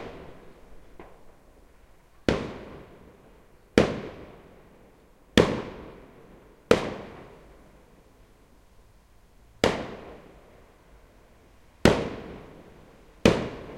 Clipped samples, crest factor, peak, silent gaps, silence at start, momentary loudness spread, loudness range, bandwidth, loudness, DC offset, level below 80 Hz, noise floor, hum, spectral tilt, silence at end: under 0.1%; 30 dB; 0 dBFS; none; 0 s; 27 LU; 6 LU; 16.5 kHz; -26 LUFS; under 0.1%; -48 dBFS; -56 dBFS; none; -5.5 dB/octave; 0 s